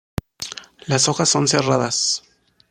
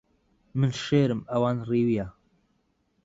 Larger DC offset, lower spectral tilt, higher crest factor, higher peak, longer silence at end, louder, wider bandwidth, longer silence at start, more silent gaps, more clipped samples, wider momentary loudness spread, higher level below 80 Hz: neither; second, -3 dB/octave vs -7.5 dB/octave; about the same, 18 dB vs 18 dB; first, -2 dBFS vs -10 dBFS; second, 0.5 s vs 0.95 s; first, -18 LUFS vs -26 LUFS; first, 15.5 kHz vs 7.8 kHz; second, 0.4 s vs 0.55 s; neither; neither; first, 15 LU vs 8 LU; first, -50 dBFS vs -58 dBFS